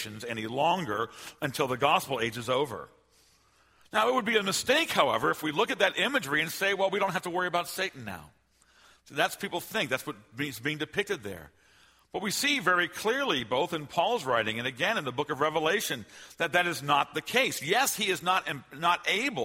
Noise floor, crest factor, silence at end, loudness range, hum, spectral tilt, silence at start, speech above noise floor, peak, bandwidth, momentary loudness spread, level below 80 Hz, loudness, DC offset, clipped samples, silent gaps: -64 dBFS; 22 dB; 0 s; 6 LU; none; -3 dB/octave; 0 s; 35 dB; -8 dBFS; 16 kHz; 10 LU; -68 dBFS; -28 LUFS; under 0.1%; under 0.1%; none